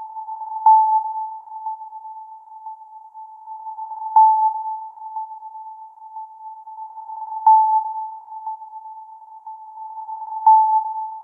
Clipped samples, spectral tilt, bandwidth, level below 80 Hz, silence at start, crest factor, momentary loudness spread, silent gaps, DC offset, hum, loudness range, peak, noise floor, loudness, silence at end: under 0.1%; -4.5 dB/octave; 1.5 kHz; under -90 dBFS; 0 s; 16 dB; 24 LU; none; under 0.1%; none; 2 LU; -4 dBFS; -40 dBFS; -18 LUFS; 0 s